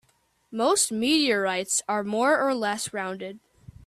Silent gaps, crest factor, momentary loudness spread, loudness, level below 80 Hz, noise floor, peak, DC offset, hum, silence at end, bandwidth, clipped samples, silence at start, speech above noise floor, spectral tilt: none; 16 dB; 12 LU; -24 LUFS; -64 dBFS; -67 dBFS; -10 dBFS; under 0.1%; none; 0.5 s; 15.5 kHz; under 0.1%; 0.5 s; 42 dB; -2 dB/octave